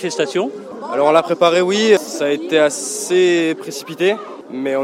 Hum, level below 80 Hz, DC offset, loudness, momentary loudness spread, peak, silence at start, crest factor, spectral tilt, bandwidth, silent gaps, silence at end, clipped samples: none; -72 dBFS; under 0.1%; -16 LUFS; 12 LU; 0 dBFS; 0 s; 16 dB; -3.5 dB/octave; 16 kHz; none; 0 s; under 0.1%